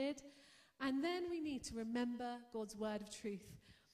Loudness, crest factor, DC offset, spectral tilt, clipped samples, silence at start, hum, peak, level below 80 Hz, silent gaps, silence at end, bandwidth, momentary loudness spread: -44 LUFS; 16 dB; under 0.1%; -4.5 dB/octave; under 0.1%; 0 s; none; -30 dBFS; -70 dBFS; none; 0.2 s; 15 kHz; 17 LU